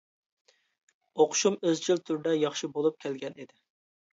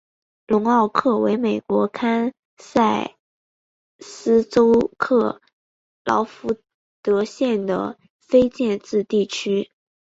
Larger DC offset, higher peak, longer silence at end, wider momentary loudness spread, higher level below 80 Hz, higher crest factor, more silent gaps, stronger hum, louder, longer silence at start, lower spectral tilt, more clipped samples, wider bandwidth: neither; second, -10 dBFS vs 0 dBFS; first, 0.7 s vs 0.5 s; first, 15 LU vs 11 LU; second, -82 dBFS vs -58 dBFS; about the same, 20 dB vs 20 dB; second, none vs 2.39-2.57 s, 3.19-3.99 s, 5.53-6.05 s, 6.74-7.03 s, 8.10-8.20 s; neither; second, -28 LUFS vs -20 LUFS; first, 1.15 s vs 0.5 s; second, -3.5 dB/octave vs -6 dB/octave; neither; about the same, 8 kHz vs 8 kHz